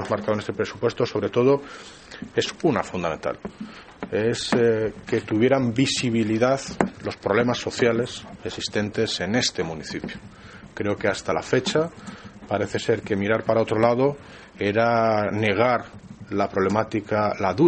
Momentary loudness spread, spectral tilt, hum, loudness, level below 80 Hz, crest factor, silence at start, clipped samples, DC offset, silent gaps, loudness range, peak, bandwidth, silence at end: 18 LU; -5 dB/octave; none; -23 LUFS; -54 dBFS; 22 dB; 0 s; under 0.1%; under 0.1%; none; 4 LU; -2 dBFS; 8.8 kHz; 0 s